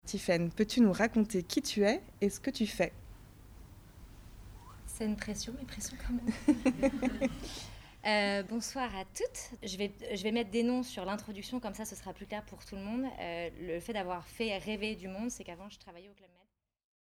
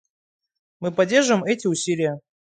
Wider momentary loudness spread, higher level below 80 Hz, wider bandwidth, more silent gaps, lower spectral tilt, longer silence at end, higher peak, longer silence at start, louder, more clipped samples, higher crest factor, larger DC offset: first, 19 LU vs 9 LU; first, -54 dBFS vs -70 dBFS; first, over 20 kHz vs 9.6 kHz; neither; about the same, -4.5 dB/octave vs -4 dB/octave; first, 1 s vs 0.25 s; second, -14 dBFS vs -4 dBFS; second, 0.05 s vs 0.8 s; second, -35 LUFS vs -21 LUFS; neither; about the same, 20 dB vs 18 dB; neither